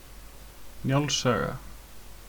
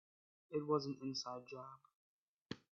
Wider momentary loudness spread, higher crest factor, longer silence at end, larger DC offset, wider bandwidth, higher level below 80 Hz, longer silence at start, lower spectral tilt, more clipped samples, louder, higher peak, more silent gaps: first, 23 LU vs 16 LU; about the same, 18 dB vs 22 dB; second, 0 s vs 0.2 s; neither; first, 19.5 kHz vs 7.4 kHz; first, -48 dBFS vs -86 dBFS; second, 0 s vs 0.5 s; about the same, -4.5 dB/octave vs -5 dB/octave; neither; first, -27 LUFS vs -44 LUFS; first, -12 dBFS vs -24 dBFS; second, none vs 1.95-2.46 s